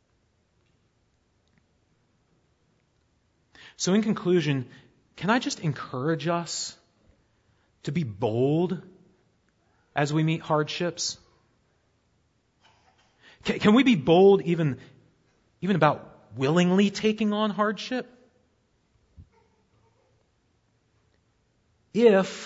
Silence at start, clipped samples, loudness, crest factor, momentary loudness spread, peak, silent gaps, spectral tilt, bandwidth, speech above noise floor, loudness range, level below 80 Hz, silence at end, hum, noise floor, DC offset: 3.8 s; under 0.1%; -25 LUFS; 22 dB; 14 LU; -4 dBFS; none; -5.5 dB/octave; 8 kHz; 45 dB; 9 LU; -64 dBFS; 0 s; none; -69 dBFS; under 0.1%